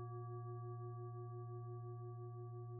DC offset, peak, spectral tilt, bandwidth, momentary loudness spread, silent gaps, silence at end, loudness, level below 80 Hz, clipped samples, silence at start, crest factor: under 0.1%; -40 dBFS; -6 dB/octave; 1.8 kHz; 2 LU; none; 0 s; -50 LUFS; -82 dBFS; under 0.1%; 0 s; 8 dB